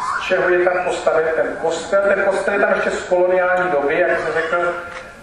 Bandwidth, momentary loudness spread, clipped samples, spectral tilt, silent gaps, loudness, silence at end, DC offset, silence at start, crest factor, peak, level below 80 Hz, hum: 10.5 kHz; 5 LU; under 0.1%; -4.5 dB/octave; none; -17 LUFS; 0 s; under 0.1%; 0 s; 14 dB; -2 dBFS; -50 dBFS; none